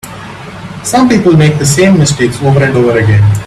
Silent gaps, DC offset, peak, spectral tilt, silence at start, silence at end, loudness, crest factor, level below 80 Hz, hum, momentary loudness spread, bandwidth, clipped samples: none; under 0.1%; 0 dBFS; -5.5 dB/octave; 0.05 s; 0 s; -8 LUFS; 8 dB; -36 dBFS; none; 19 LU; 14 kHz; under 0.1%